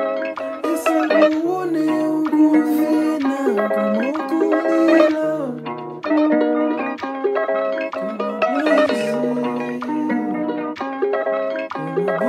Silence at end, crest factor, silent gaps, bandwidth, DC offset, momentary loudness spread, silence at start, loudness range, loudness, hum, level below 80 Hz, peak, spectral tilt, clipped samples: 0 s; 18 dB; none; 15 kHz; under 0.1%; 10 LU; 0 s; 3 LU; -19 LUFS; none; -72 dBFS; -2 dBFS; -6 dB/octave; under 0.1%